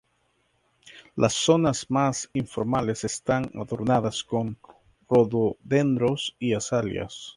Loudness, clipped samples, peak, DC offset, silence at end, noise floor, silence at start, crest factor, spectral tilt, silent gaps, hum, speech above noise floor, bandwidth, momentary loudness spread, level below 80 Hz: -25 LUFS; under 0.1%; -6 dBFS; under 0.1%; 0.05 s; -69 dBFS; 0.85 s; 20 dB; -5 dB/octave; none; none; 45 dB; 11.5 kHz; 9 LU; -56 dBFS